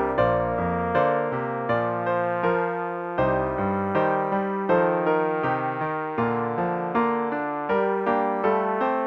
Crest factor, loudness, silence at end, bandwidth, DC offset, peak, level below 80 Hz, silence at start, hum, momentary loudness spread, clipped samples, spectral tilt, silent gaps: 14 dB; -24 LUFS; 0 s; 6 kHz; under 0.1%; -8 dBFS; -50 dBFS; 0 s; none; 5 LU; under 0.1%; -9 dB/octave; none